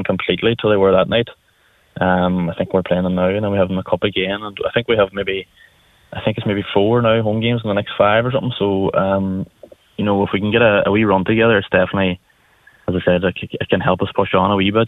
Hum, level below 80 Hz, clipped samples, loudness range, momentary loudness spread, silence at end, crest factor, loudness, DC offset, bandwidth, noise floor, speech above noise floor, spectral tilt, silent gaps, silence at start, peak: none; -48 dBFS; under 0.1%; 3 LU; 9 LU; 0 s; 16 dB; -17 LUFS; under 0.1%; 4.1 kHz; -56 dBFS; 40 dB; -8.5 dB/octave; none; 0 s; 0 dBFS